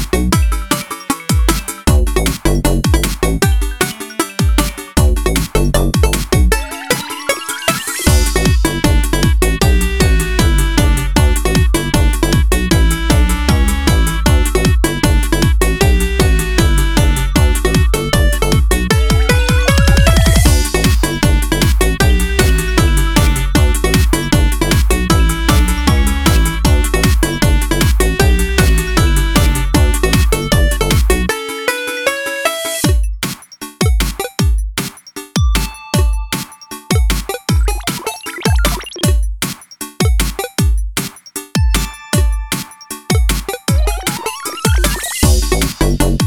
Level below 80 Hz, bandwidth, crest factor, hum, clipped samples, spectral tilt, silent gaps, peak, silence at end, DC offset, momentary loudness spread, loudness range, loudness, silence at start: -16 dBFS; 18.5 kHz; 12 dB; none; under 0.1%; -4.5 dB/octave; none; 0 dBFS; 0 s; under 0.1%; 6 LU; 5 LU; -14 LUFS; 0 s